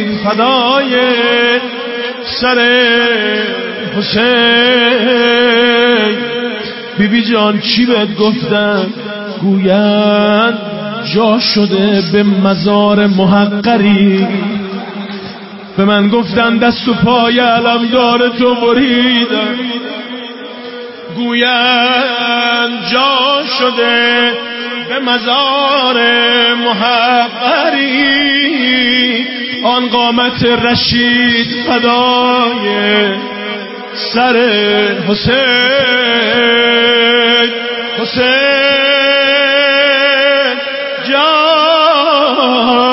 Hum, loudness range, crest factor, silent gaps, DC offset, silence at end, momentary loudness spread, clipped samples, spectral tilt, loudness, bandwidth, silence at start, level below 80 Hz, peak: none; 3 LU; 10 dB; none; under 0.1%; 0 s; 10 LU; under 0.1%; -8 dB/octave; -10 LUFS; 5.8 kHz; 0 s; -46 dBFS; 0 dBFS